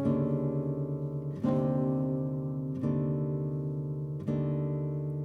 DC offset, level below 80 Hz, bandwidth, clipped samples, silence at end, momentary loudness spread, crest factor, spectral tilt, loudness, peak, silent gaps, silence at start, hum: under 0.1%; -56 dBFS; 3.6 kHz; under 0.1%; 0 s; 6 LU; 14 dB; -11.5 dB/octave; -32 LUFS; -18 dBFS; none; 0 s; none